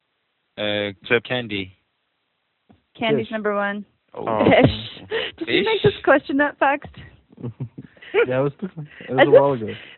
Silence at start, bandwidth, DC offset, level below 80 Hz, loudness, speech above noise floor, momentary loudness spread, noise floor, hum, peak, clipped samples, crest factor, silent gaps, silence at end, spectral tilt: 0.55 s; 4.4 kHz; under 0.1%; -52 dBFS; -20 LUFS; 52 dB; 21 LU; -72 dBFS; none; 0 dBFS; under 0.1%; 22 dB; none; 0.05 s; -3.5 dB/octave